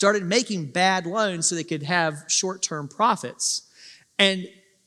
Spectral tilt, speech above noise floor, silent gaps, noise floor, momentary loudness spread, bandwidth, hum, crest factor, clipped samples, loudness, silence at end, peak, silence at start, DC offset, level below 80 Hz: -2.5 dB/octave; 27 dB; none; -50 dBFS; 8 LU; 13.5 kHz; none; 22 dB; under 0.1%; -23 LUFS; 0.35 s; -4 dBFS; 0 s; under 0.1%; -80 dBFS